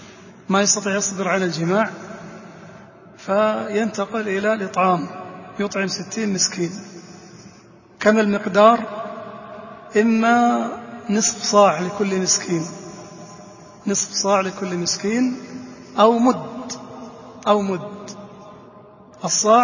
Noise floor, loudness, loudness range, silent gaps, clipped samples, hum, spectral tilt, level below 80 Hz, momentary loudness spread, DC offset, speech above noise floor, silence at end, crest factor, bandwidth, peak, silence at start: -47 dBFS; -19 LUFS; 5 LU; none; under 0.1%; none; -3.5 dB/octave; -62 dBFS; 22 LU; under 0.1%; 29 dB; 0 s; 20 dB; 7.4 kHz; 0 dBFS; 0 s